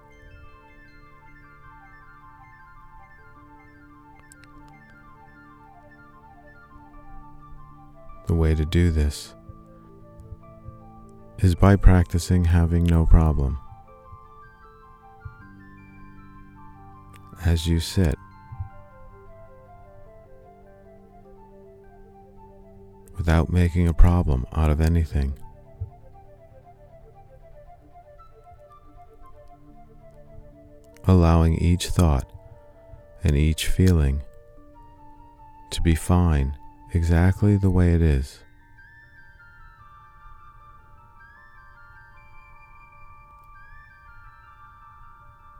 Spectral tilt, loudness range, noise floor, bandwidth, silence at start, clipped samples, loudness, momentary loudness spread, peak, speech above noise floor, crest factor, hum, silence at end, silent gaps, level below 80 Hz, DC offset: -7 dB/octave; 11 LU; -49 dBFS; 14 kHz; 0.45 s; under 0.1%; -22 LUFS; 26 LU; 0 dBFS; 31 dB; 24 dB; none; 1.85 s; none; -30 dBFS; under 0.1%